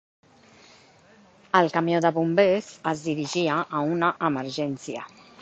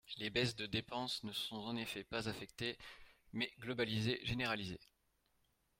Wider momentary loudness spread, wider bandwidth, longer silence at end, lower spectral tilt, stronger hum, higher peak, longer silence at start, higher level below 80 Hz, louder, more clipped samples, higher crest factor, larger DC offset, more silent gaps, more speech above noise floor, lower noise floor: about the same, 10 LU vs 11 LU; second, 8.4 kHz vs 16.5 kHz; second, 0.35 s vs 0.95 s; about the same, -5.5 dB/octave vs -4.5 dB/octave; neither; first, -4 dBFS vs -22 dBFS; first, 1.55 s vs 0.05 s; about the same, -68 dBFS vs -66 dBFS; first, -24 LUFS vs -41 LUFS; neither; about the same, 22 dB vs 20 dB; neither; neither; second, 31 dB vs 37 dB; second, -55 dBFS vs -79 dBFS